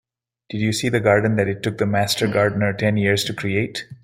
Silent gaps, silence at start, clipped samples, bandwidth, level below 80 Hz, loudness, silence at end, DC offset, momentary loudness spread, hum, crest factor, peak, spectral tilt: none; 0.5 s; under 0.1%; 16 kHz; -54 dBFS; -20 LUFS; 0.1 s; under 0.1%; 6 LU; none; 18 dB; -2 dBFS; -5 dB/octave